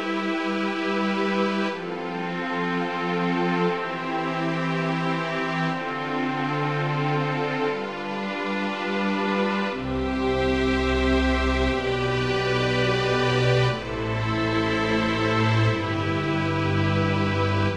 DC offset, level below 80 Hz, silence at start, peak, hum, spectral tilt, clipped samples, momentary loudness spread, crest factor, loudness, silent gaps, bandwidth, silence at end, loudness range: 0.2%; -38 dBFS; 0 s; -8 dBFS; none; -6.5 dB/octave; under 0.1%; 6 LU; 16 dB; -24 LUFS; none; 11 kHz; 0 s; 3 LU